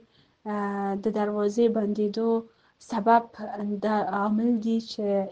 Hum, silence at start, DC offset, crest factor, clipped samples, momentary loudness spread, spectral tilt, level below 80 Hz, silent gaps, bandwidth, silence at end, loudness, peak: none; 0.45 s; under 0.1%; 20 dB; under 0.1%; 10 LU; -7 dB/octave; -68 dBFS; none; 8.2 kHz; 0 s; -26 LUFS; -8 dBFS